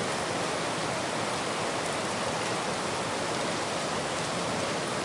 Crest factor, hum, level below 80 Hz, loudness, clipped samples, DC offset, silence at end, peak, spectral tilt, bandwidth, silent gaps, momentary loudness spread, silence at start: 14 dB; none; -62 dBFS; -30 LUFS; under 0.1%; under 0.1%; 0 s; -18 dBFS; -3 dB/octave; 11.5 kHz; none; 1 LU; 0 s